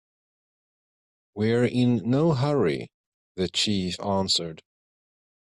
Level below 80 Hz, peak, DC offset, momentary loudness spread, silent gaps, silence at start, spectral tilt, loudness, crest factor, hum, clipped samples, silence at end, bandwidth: -62 dBFS; -10 dBFS; under 0.1%; 14 LU; 2.94-3.35 s; 1.35 s; -5.5 dB/octave; -24 LUFS; 16 dB; none; under 0.1%; 0.95 s; 12 kHz